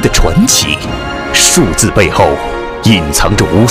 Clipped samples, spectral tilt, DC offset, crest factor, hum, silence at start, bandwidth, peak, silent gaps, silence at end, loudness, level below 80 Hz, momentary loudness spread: 0.8%; -3.5 dB/octave; under 0.1%; 10 dB; none; 0 s; over 20 kHz; 0 dBFS; none; 0 s; -9 LUFS; -20 dBFS; 9 LU